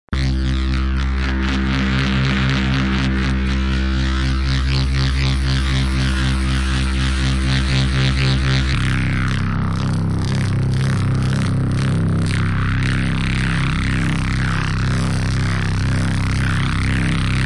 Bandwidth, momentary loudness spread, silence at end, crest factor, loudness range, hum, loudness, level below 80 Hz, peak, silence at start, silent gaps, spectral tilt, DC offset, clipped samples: 11.5 kHz; 2 LU; 0 s; 10 dB; 1 LU; none; -19 LUFS; -22 dBFS; -8 dBFS; 0.1 s; none; -6 dB/octave; under 0.1%; under 0.1%